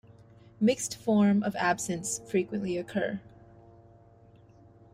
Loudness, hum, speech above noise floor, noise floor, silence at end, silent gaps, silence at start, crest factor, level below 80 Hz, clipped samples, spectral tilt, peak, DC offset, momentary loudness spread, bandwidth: -29 LUFS; none; 29 dB; -56 dBFS; 1.65 s; none; 0.6 s; 16 dB; -64 dBFS; under 0.1%; -5 dB/octave; -14 dBFS; under 0.1%; 8 LU; 15.5 kHz